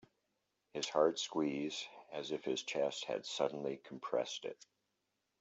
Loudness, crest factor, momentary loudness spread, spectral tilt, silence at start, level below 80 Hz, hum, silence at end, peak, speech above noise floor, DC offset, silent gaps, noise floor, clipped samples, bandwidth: -39 LUFS; 22 dB; 13 LU; -3.5 dB/octave; 0.75 s; -86 dBFS; none; 0.85 s; -18 dBFS; 47 dB; under 0.1%; none; -85 dBFS; under 0.1%; 8.2 kHz